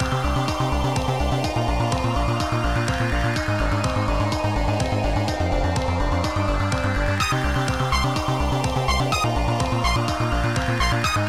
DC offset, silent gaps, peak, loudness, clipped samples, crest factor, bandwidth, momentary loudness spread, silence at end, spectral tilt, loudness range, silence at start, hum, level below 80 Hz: 0.8%; none; -8 dBFS; -22 LUFS; under 0.1%; 14 dB; 15.5 kHz; 2 LU; 0 s; -5.5 dB/octave; 1 LU; 0 s; none; -28 dBFS